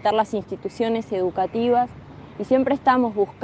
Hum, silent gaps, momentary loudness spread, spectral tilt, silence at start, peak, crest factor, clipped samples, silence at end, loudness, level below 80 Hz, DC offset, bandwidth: none; none; 13 LU; -6.5 dB/octave; 0.05 s; -6 dBFS; 16 dB; under 0.1%; 0 s; -22 LUFS; -56 dBFS; under 0.1%; 8.8 kHz